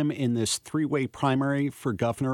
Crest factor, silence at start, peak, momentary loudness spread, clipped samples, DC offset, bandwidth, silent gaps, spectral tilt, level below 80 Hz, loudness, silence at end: 16 dB; 0 s; -10 dBFS; 3 LU; under 0.1%; under 0.1%; 17.5 kHz; none; -5.5 dB/octave; -60 dBFS; -27 LUFS; 0 s